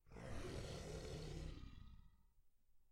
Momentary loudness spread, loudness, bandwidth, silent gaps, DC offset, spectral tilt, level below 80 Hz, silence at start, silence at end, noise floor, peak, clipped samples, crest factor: 13 LU; -53 LUFS; 16 kHz; none; under 0.1%; -5.5 dB/octave; -58 dBFS; 0.05 s; 0 s; -72 dBFS; -38 dBFS; under 0.1%; 16 dB